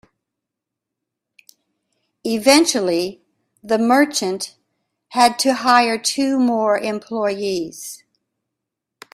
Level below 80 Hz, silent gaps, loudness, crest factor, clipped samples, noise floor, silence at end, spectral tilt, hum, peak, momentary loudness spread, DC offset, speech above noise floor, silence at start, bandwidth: -64 dBFS; none; -17 LUFS; 20 dB; under 0.1%; -83 dBFS; 1.15 s; -2.5 dB/octave; none; 0 dBFS; 15 LU; under 0.1%; 66 dB; 2.25 s; 16 kHz